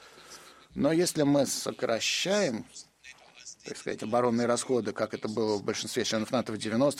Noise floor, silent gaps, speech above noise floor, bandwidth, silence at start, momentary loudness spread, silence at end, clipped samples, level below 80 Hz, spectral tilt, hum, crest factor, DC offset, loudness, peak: -54 dBFS; none; 25 dB; 16 kHz; 0 s; 21 LU; 0 s; under 0.1%; -66 dBFS; -4 dB/octave; none; 18 dB; under 0.1%; -29 LUFS; -12 dBFS